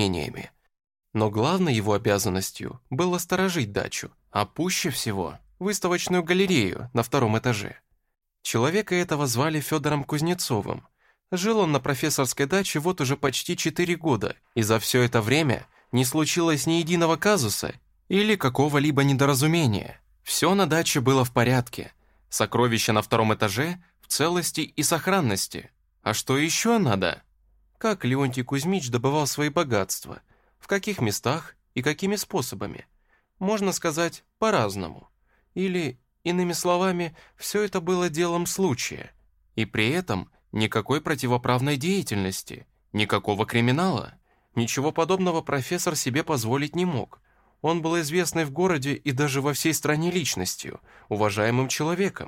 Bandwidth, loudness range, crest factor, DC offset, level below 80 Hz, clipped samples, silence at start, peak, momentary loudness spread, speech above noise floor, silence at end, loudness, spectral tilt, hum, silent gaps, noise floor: 16.5 kHz; 4 LU; 18 dB; under 0.1%; -56 dBFS; under 0.1%; 0 s; -6 dBFS; 11 LU; 40 dB; 0 s; -25 LUFS; -4.5 dB/octave; none; none; -65 dBFS